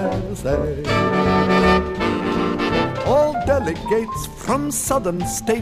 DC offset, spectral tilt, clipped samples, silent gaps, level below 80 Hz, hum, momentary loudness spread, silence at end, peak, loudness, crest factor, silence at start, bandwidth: under 0.1%; -5 dB/octave; under 0.1%; none; -34 dBFS; none; 7 LU; 0 s; -4 dBFS; -19 LUFS; 14 dB; 0 s; 15.5 kHz